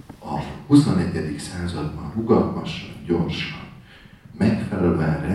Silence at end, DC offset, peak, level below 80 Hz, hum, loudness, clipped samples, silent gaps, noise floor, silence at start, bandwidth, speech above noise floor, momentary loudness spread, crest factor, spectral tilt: 0 s; under 0.1%; -4 dBFS; -44 dBFS; none; -23 LUFS; under 0.1%; none; -46 dBFS; 0.1 s; 12 kHz; 25 dB; 13 LU; 20 dB; -7 dB/octave